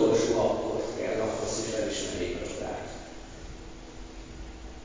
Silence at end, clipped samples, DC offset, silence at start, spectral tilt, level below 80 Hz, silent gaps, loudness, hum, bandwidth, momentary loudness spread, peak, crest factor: 0 s; under 0.1%; under 0.1%; 0 s; -4.5 dB/octave; -46 dBFS; none; -30 LUFS; none; 7.8 kHz; 19 LU; -12 dBFS; 18 dB